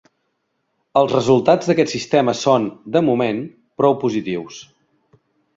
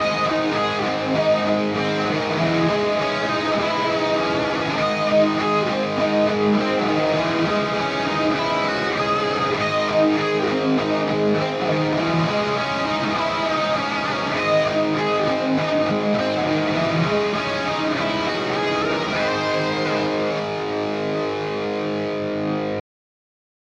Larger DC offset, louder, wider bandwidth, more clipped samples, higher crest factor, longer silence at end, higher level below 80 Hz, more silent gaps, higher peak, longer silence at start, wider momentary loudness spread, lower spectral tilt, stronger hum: neither; first, -18 LUFS vs -21 LUFS; second, 7.8 kHz vs 10.5 kHz; neither; about the same, 18 dB vs 14 dB; about the same, 0.95 s vs 1 s; second, -60 dBFS vs -54 dBFS; neither; first, -2 dBFS vs -6 dBFS; first, 0.95 s vs 0 s; first, 12 LU vs 5 LU; about the same, -6 dB/octave vs -5.5 dB/octave; neither